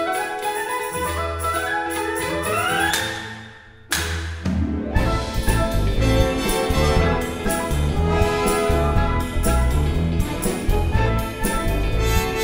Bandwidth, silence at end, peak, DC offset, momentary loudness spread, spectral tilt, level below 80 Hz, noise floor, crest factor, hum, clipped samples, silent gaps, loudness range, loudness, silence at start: 16.5 kHz; 0 s; -4 dBFS; under 0.1%; 5 LU; -5 dB/octave; -26 dBFS; -42 dBFS; 16 dB; none; under 0.1%; none; 3 LU; -22 LUFS; 0 s